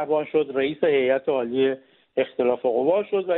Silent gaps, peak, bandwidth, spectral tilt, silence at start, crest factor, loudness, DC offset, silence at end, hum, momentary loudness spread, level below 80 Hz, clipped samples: none; -8 dBFS; 4.1 kHz; -3.5 dB/octave; 0 s; 16 dB; -23 LUFS; under 0.1%; 0 s; none; 6 LU; -68 dBFS; under 0.1%